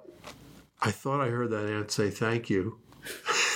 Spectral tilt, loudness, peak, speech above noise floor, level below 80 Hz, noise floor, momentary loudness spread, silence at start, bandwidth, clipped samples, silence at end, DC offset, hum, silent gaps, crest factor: -4 dB/octave; -30 LUFS; -12 dBFS; 24 dB; -68 dBFS; -53 dBFS; 17 LU; 0.1 s; 17 kHz; under 0.1%; 0 s; under 0.1%; none; none; 18 dB